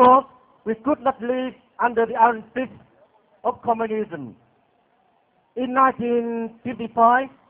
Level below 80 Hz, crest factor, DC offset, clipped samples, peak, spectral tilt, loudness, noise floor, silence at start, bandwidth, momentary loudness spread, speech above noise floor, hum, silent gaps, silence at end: -62 dBFS; 18 dB; under 0.1%; under 0.1%; -4 dBFS; -9.5 dB/octave; -22 LUFS; -63 dBFS; 0 s; 4 kHz; 15 LU; 41 dB; none; none; 0.2 s